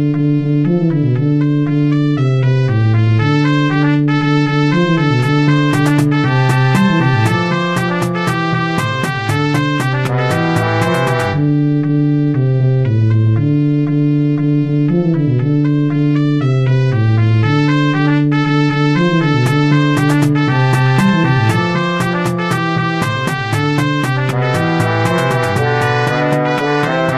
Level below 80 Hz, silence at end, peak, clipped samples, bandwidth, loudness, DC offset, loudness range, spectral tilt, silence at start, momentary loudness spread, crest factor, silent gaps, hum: -44 dBFS; 0 s; 0 dBFS; under 0.1%; 13.5 kHz; -14 LUFS; 0.5%; 2 LU; -7 dB/octave; 0 s; 3 LU; 12 dB; none; none